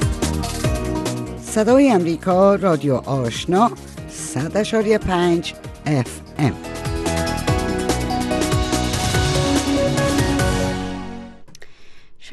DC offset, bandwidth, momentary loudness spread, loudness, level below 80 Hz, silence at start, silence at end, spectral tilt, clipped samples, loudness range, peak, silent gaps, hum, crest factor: under 0.1%; 12.5 kHz; 12 LU; -19 LUFS; -32 dBFS; 0 s; 0 s; -5.5 dB/octave; under 0.1%; 4 LU; -2 dBFS; none; none; 16 dB